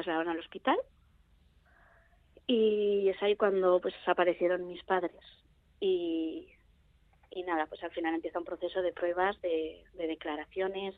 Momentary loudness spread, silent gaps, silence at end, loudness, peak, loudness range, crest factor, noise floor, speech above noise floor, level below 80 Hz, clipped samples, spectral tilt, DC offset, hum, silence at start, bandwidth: 11 LU; none; 0.05 s; -32 LUFS; -12 dBFS; 6 LU; 20 dB; -65 dBFS; 34 dB; -66 dBFS; under 0.1%; -8 dB/octave; under 0.1%; none; 0 s; 4.5 kHz